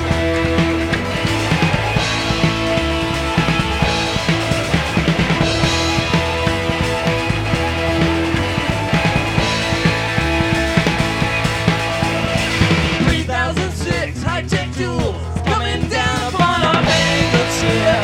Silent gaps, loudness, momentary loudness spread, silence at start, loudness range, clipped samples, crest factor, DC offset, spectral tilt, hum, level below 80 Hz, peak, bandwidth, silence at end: none; -17 LUFS; 4 LU; 0 s; 2 LU; under 0.1%; 16 dB; under 0.1%; -5 dB/octave; none; -30 dBFS; 0 dBFS; 16 kHz; 0 s